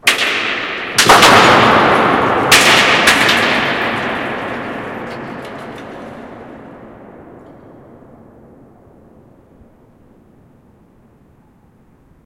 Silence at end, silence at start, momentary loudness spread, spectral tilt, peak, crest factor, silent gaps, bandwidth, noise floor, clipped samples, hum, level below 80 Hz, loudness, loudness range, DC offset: 5.05 s; 0.05 s; 24 LU; -2.5 dB/octave; 0 dBFS; 16 dB; none; over 20 kHz; -49 dBFS; 0.2%; none; -46 dBFS; -10 LUFS; 23 LU; under 0.1%